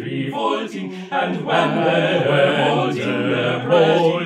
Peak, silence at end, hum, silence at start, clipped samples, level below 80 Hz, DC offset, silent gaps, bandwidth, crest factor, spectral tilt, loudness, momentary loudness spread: -2 dBFS; 0 s; none; 0 s; under 0.1%; -70 dBFS; under 0.1%; none; 11 kHz; 16 dB; -6.5 dB/octave; -18 LUFS; 9 LU